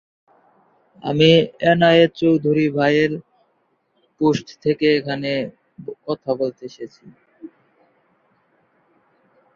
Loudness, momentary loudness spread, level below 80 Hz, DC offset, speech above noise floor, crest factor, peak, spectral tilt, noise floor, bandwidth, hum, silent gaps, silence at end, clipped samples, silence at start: -18 LUFS; 21 LU; -60 dBFS; under 0.1%; 48 dB; 20 dB; -2 dBFS; -6.5 dB/octave; -66 dBFS; 7.4 kHz; none; none; 2.1 s; under 0.1%; 1.05 s